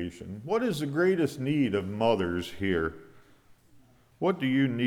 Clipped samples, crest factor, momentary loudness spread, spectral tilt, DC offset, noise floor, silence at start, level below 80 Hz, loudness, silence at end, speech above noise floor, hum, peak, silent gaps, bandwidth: under 0.1%; 18 dB; 6 LU; -6.5 dB/octave; under 0.1%; -58 dBFS; 0 s; -56 dBFS; -28 LUFS; 0 s; 31 dB; none; -10 dBFS; none; 16 kHz